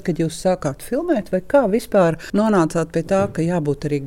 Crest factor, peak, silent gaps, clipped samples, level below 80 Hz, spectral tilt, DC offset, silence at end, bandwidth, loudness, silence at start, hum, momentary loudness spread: 14 dB; -4 dBFS; none; under 0.1%; -44 dBFS; -7 dB/octave; under 0.1%; 0 s; 17 kHz; -19 LUFS; 0 s; none; 5 LU